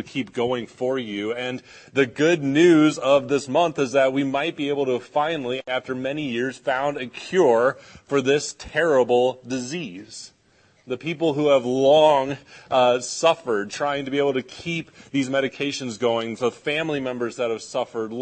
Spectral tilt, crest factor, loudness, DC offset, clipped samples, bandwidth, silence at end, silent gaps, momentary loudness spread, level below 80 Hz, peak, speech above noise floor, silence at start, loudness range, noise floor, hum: -5 dB/octave; 18 dB; -22 LUFS; under 0.1%; under 0.1%; 8.8 kHz; 0 s; none; 11 LU; -62 dBFS; -4 dBFS; 37 dB; 0 s; 5 LU; -59 dBFS; none